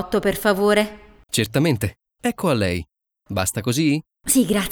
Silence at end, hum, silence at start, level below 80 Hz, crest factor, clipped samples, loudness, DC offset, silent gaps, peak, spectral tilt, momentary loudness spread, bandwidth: 0 s; none; 0 s; -46 dBFS; 18 dB; under 0.1%; -21 LUFS; under 0.1%; none; -4 dBFS; -4.5 dB/octave; 9 LU; over 20 kHz